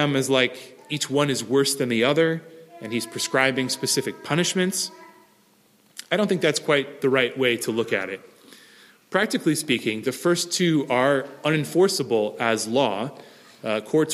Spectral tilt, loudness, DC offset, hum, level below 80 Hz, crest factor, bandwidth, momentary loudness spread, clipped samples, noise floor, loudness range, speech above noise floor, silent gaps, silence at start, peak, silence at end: -4 dB/octave; -23 LUFS; under 0.1%; none; -70 dBFS; 20 dB; 15.5 kHz; 10 LU; under 0.1%; -59 dBFS; 3 LU; 37 dB; none; 0 s; -4 dBFS; 0 s